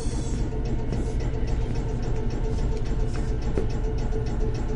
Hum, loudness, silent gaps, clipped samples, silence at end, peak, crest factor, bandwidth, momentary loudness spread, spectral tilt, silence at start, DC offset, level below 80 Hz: none; -29 LUFS; none; under 0.1%; 0 s; -10 dBFS; 16 dB; 10.5 kHz; 1 LU; -7 dB/octave; 0 s; under 0.1%; -26 dBFS